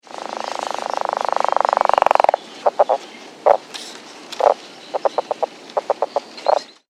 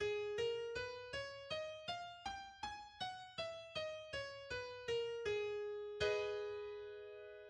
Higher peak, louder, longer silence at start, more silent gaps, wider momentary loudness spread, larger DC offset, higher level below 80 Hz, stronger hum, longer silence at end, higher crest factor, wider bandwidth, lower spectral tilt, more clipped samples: first, 0 dBFS vs -28 dBFS; first, -20 LUFS vs -45 LUFS; first, 0.15 s vs 0 s; neither; first, 14 LU vs 8 LU; neither; about the same, -66 dBFS vs -70 dBFS; neither; first, 0.25 s vs 0 s; about the same, 20 dB vs 18 dB; first, 13.5 kHz vs 10.5 kHz; about the same, -2 dB/octave vs -3 dB/octave; neither